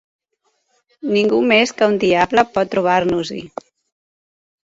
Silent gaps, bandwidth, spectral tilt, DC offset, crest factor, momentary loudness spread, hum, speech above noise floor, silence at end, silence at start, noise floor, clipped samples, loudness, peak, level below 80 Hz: none; 8 kHz; -5 dB/octave; under 0.1%; 18 dB; 16 LU; none; 52 dB; 1.25 s; 1.05 s; -68 dBFS; under 0.1%; -16 LUFS; 0 dBFS; -54 dBFS